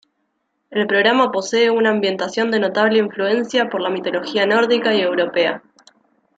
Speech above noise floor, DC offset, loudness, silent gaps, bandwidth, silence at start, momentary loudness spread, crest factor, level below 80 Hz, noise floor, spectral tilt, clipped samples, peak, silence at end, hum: 53 dB; under 0.1%; -17 LUFS; none; 8 kHz; 0.7 s; 6 LU; 16 dB; -66 dBFS; -70 dBFS; -4 dB/octave; under 0.1%; -2 dBFS; 0.8 s; none